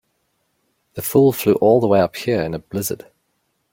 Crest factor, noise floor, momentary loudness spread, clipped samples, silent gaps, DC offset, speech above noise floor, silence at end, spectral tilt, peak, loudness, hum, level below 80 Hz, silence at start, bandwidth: 16 dB; -69 dBFS; 13 LU; under 0.1%; none; under 0.1%; 52 dB; 0.75 s; -6 dB/octave; -2 dBFS; -18 LUFS; none; -54 dBFS; 0.95 s; 17 kHz